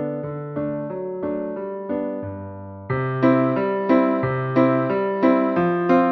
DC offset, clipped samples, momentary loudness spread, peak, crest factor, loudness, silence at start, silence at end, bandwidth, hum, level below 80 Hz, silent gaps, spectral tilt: under 0.1%; under 0.1%; 11 LU; -4 dBFS; 16 dB; -21 LUFS; 0 s; 0 s; 5.8 kHz; none; -58 dBFS; none; -10 dB/octave